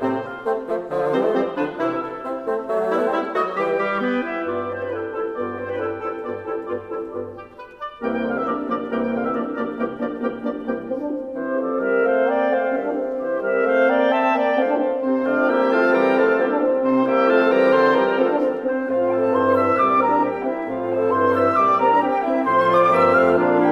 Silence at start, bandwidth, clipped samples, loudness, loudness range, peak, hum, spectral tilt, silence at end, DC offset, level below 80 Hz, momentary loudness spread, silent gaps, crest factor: 0 s; 6.6 kHz; under 0.1%; -20 LUFS; 9 LU; -4 dBFS; none; -7 dB/octave; 0 s; under 0.1%; -58 dBFS; 11 LU; none; 14 dB